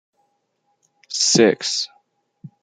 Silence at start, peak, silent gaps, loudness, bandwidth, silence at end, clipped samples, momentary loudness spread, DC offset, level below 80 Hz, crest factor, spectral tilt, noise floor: 1.1 s; -2 dBFS; none; -18 LUFS; 10.5 kHz; 0.15 s; under 0.1%; 15 LU; under 0.1%; -68 dBFS; 22 dB; -2.5 dB/octave; -70 dBFS